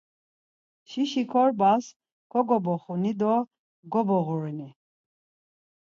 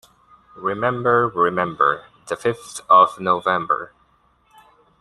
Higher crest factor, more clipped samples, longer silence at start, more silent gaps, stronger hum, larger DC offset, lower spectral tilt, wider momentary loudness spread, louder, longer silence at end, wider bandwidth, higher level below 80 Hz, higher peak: about the same, 18 dB vs 20 dB; neither; first, 0.9 s vs 0.55 s; first, 1.96-2.00 s, 2.12-2.30 s, 3.59-3.83 s vs none; neither; neither; first, -7 dB/octave vs -5 dB/octave; about the same, 15 LU vs 15 LU; second, -26 LUFS vs -19 LUFS; about the same, 1.2 s vs 1.15 s; second, 7.6 kHz vs 12.5 kHz; second, -78 dBFS vs -60 dBFS; second, -10 dBFS vs -2 dBFS